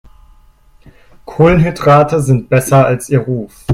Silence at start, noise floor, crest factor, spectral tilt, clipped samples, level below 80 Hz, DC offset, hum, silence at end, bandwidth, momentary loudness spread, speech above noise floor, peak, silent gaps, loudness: 1.3 s; -45 dBFS; 12 dB; -7 dB/octave; under 0.1%; -34 dBFS; under 0.1%; none; 0 s; 15.5 kHz; 10 LU; 34 dB; 0 dBFS; none; -11 LUFS